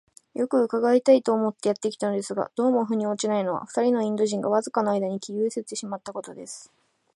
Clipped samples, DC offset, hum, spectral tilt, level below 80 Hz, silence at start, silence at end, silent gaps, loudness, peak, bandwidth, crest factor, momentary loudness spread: under 0.1%; under 0.1%; none; -5 dB/octave; -76 dBFS; 0.35 s; 0.5 s; none; -25 LUFS; -6 dBFS; 11.5 kHz; 18 dB; 15 LU